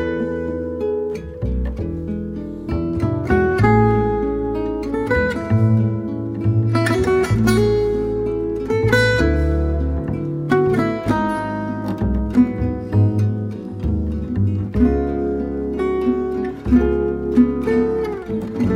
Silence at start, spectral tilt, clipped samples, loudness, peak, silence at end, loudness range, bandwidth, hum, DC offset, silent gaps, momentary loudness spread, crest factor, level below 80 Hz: 0 s; -8 dB/octave; under 0.1%; -19 LUFS; -2 dBFS; 0 s; 3 LU; 15.5 kHz; none; under 0.1%; none; 9 LU; 16 dB; -28 dBFS